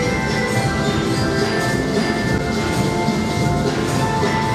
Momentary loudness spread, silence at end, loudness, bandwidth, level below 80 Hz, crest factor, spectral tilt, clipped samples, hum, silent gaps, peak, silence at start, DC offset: 1 LU; 0 s; -19 LUFS; 15 kHz; -34 dBFS; 14 dB; -5.5 dB/octave; under 0.1%; none; none; -4 dBFS; 0 s; under 0.1%